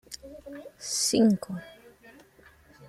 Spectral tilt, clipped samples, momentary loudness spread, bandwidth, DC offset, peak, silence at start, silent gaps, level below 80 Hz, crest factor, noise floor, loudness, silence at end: -4 dB/octave; under 0.1%; 22 LU; 15 kHz; under 0.1%; -12 dBFS; 0.1 s; none; -64 dBFS; 18 dB; -57 dBFS; -25 LUFS; 0.05 s